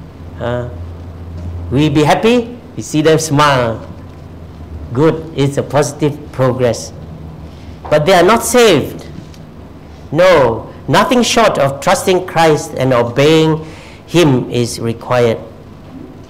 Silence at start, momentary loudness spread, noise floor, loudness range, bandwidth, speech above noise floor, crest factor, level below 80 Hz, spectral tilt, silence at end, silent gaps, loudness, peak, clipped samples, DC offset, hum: 0 s; 22 LU; -33 dBFS; 5 LU; 16 kHz; 22 dB; 10 dB; -38 dBFS; -5 dB/octave; 0.05 s; none; -12 LUFS; -4 dBFS; under 0.1%; 0.5%; none